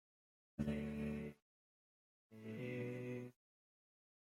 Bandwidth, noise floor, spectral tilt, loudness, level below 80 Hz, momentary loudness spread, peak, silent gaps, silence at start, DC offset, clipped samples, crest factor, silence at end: 15.5 kHz; under -90 dBFS; -8 dB/octave; -47 LUFS; -66 dBFS; 13 LU; -28 dBFS; 1.42-2.30 s; 0.6 s; under 0.1%; under 0.1%; 20 dB; 0.95 s